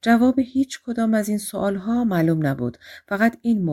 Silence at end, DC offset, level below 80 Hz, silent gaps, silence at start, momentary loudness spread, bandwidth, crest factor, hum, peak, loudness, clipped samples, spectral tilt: 0 s; under 0.1%; -54 dBFS; none; 0.05 s; 7 LU; 16 kHz; 16 dB; none; -6 dBFS; -22 LUFS; under 0.1%; -6.5 dB/octave